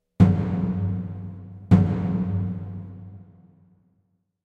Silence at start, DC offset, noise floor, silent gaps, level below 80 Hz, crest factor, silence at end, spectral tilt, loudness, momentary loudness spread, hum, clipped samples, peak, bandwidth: 0.2 s; under 0.1%; -70 dBFS; none; -44 dBFS; 20 dB; 1.2 s; -10.5 dB/octave; -23 LUFS; 21 LU; none; under 0.1%; -4 dBFS; 4.9 kHz